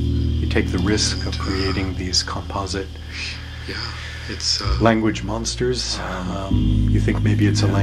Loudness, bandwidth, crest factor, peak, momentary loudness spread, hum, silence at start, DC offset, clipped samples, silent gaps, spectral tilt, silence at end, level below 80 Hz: -21 LUFS; 12 kHz; 20 dB; 0 dBFS; 11 LU; none; 0 s; under 0.1%; under 0.1%; none; -5 dB/octave; 0 s; -28 dBFS